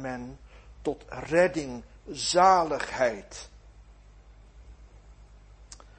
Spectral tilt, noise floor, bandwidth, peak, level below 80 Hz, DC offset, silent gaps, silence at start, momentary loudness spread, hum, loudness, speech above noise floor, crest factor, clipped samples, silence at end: -3.5 dB/octave; -52 dBFS; 8.8 kHz; -8 dBFS; -52 dBFS; under 0.1%; none; 0 s; 23 LU; 50 Hz at -55 dBFS; -26 LUFS; 26 dB; 22 dB; under 0.1%; 0.2 s